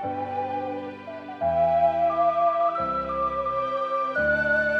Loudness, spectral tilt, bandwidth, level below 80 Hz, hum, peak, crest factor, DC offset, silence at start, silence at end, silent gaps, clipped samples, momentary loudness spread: -24 LUFS; -7 dB/octave; 6.4 kHz; -52 dBFS; none; -12 dBFS; 14 dB; under 0.1%; 0 s; 0 s; none; under 0.1%; 10 LU